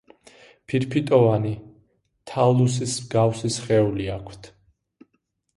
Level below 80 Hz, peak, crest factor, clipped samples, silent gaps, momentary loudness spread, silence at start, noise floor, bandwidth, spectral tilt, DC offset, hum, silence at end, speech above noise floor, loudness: -52 dBFS; -4 dBFS; 20 dB; under 0.1%; none; 14 LU; 0.7 s; -73 dBFS; 11.5 kHz; -6 dB/octave; under 0.1%; none; 1.1 s; 51 dB; -22 LUFS